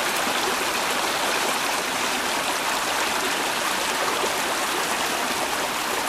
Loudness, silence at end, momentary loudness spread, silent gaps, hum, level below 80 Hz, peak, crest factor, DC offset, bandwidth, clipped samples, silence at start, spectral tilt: -23 LUFS; 0 s; 1 LU; none; none; -56 dBFS; -8 dBFS; 16 dB; under 0.1%; 16 kHz; under 0.1%; 0 s; -0.5 dB/octave